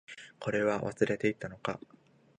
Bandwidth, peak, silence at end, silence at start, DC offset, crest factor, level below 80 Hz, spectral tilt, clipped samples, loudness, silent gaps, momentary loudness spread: 10 kHz; -12 dBFS; 0.65 s; 0.1 s; under 0.1%; 22 dB; -66 dBFS; -6 dB/octave; under 0.1%; -33 LUFS; none; 11 LU